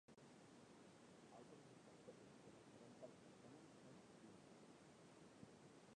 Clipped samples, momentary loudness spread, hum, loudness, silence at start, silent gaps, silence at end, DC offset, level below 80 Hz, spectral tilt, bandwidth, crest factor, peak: under 0.1%; 3 LU; none; -65 LUFS; 0.1 s; none; 0 s; under 0.1%; under -90 dBFS; -5 dB/octave; 10 kHz; 18 dB; -46 dBFS